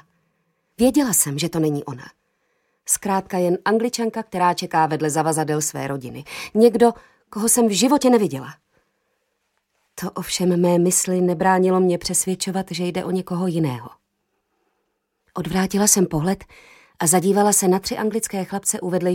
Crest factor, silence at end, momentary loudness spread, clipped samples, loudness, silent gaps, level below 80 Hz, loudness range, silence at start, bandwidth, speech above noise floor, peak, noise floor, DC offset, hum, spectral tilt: 20 dB; 0 s; 13 LU; under 0.1%; -19 LUFS; none; -54 dBFS; 4 LU; 0.8 s; 17 kHz; 53 dB; 0 dBFS; -73 dBFS; under 0.1%; none; -4.5 dB/octave